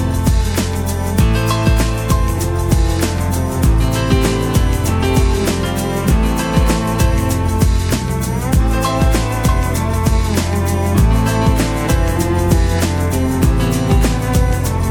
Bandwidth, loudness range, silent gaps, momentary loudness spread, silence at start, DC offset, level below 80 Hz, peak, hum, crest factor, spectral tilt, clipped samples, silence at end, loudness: 19 kHz; 1 LU; none; 3 LU; 0 s; under 0.1%; -18 dBFS; 0 dBFS; none; 14 dB; -5.5 dB/octave; under 0.1%; 0 s; -16 LUFS